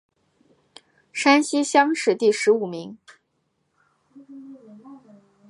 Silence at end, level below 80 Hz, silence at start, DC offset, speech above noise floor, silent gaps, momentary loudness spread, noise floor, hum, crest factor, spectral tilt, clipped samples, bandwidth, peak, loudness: 0.5 s; -80 dBFS; 1.15 s; under 0.1%; 52 dB; none; 24 LU; -72 dBFS; none; 20 dB; -3 dB/octave; under 0.1%; 11.5 kHz; -4 dBFS; -20 LUFS